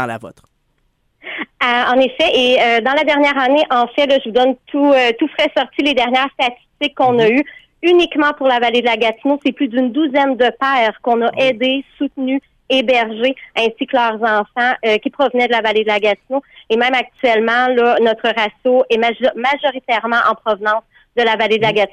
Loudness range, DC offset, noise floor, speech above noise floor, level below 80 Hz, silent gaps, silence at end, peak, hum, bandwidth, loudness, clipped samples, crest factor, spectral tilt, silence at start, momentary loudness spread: 3 LU; under 0.1%; -62 dBFS; 48 dB; -56 dBFS; none; 0.05 s; -2 dBFS; none; 10.5 kHz; -15 LUFS; under 0.1%; 12 dB; -4.5 dB/octave; 0 s; 7 LU